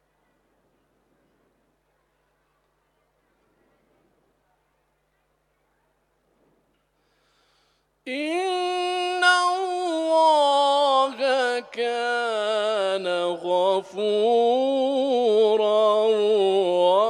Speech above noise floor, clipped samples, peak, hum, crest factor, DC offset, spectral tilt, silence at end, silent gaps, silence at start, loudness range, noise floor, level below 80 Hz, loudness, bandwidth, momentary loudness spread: 47 dB; under 0.1%; -6 dBFS; none; 18 dB; under 0.1%; -3 dB/octave; 0 s; none; 8.05 s; 9 LU; -70 dBFS; -76 dBFS; -22 LUFS; 11 kHz; 7 LU